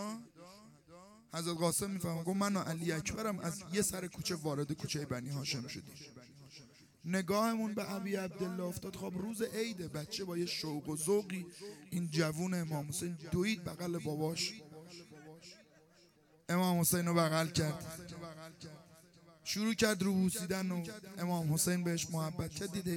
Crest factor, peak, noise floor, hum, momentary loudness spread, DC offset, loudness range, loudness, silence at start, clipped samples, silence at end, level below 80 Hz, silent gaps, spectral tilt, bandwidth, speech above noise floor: 22 dB; -16 dBFS; -66 dBFS; none; 20 LU; under 0.1%; 4 LU; -36 LUFS; 0 s; under 0.1%; 0 s; -66 dBFS; none; -4.5 dB/octave; 17 kHz; 30 dB